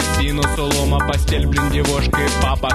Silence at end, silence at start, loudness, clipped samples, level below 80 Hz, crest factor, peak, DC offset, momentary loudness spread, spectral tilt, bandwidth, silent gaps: 0 s; 0 s; -18 LUFS; under 0.1%; -20 dBFS; 16 dB; 0 dBFS; under 0.1%; 1 LU; -4.5 dB/octave; 13.5 kHz; none